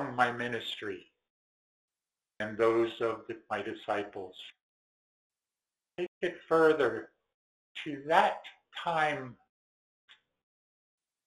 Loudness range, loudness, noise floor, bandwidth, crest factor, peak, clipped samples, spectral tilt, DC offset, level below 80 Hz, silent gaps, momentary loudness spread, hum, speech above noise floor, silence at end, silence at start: 6 LU; -32 LUFS; under -90 dBFS; 12 kHz; 24 dB; -10 dBFS; under 0.1%; -5.5 dB/octave; under 0.1%; -74 dBFS; 1.30-1.88 s, 4.61-5.30 s, 6.08-6.21 s, 7.34-7.75 s; 19 LU; none; over 59 dB; 1.9 s; 0 s